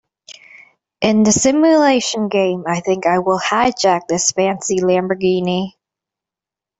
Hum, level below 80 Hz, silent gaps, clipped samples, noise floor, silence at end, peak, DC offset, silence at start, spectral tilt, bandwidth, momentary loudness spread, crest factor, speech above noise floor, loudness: none; -54 dBFS; none; under 0.1%; -88 dBFS; 1.1 s; -2 dBFS; under 0.1%; 0.3 s; -4 dB/octave; 8.4 kHz; 7 LU; 14 dB; 73 dB; -15 LUFS